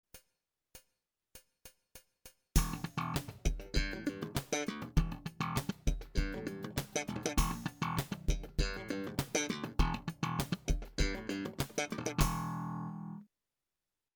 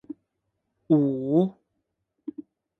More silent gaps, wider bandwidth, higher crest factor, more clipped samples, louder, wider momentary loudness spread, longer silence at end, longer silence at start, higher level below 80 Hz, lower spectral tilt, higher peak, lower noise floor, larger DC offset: neither; first, over 20 kHz vs 4 kHz; about the same, 22 dB vs 18 dB; neither; second, -37 LUFS vs -24 LUFS; second, 6 LU vs 22 LU; first, 0.9 s vs 0.4 s; about the same, 0.15 s vs 0.1 s; first, -40 dBFS vs -72 dBFS; second, -4.5 dB/octave vs -12 dB/octave; second, -14 dBFS vs -8 dBFS; first, under -90 dBFS vs -79 dBFS; neither